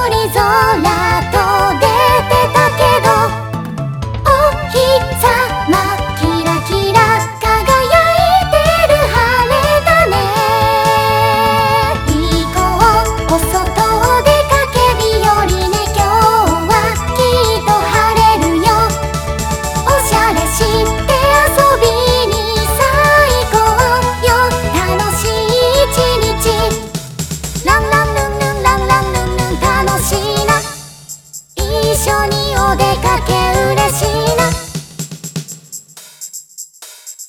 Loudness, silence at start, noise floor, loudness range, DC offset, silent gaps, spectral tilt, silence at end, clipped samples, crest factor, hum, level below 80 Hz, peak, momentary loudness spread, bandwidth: -12 LUFS; 0 s; -34 dBFS; 4 LU; under 0.1%; none; -4 dB/octave; 0 s; under 0.1%; 12 dB; none; -24 dBFS; 0 dBFS; 11 LU; 20 kHz